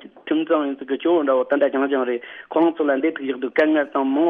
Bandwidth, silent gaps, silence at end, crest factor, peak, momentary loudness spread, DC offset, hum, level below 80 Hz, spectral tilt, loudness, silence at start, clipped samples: 4.5 kHz; none; 0 s; 14 dB; -6 dBFS; 7 LU; under 0.1%; none; -74 dBFS; -7 dB/octave; -21 LUFS; 0.05 s; under 0.1%